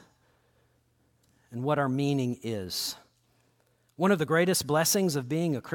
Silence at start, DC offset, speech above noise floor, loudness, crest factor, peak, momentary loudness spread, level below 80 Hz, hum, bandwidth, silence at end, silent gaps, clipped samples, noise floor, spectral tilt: 1.5 s; under 0.1%; 42 dB; -28 LUFS; 18 dB; -12 dBFS; 10 LU; -68 dBFS; none; 17.5 kHz; 0 s; none; under 0.1%; -69 dBFS; -4.5 dB/octave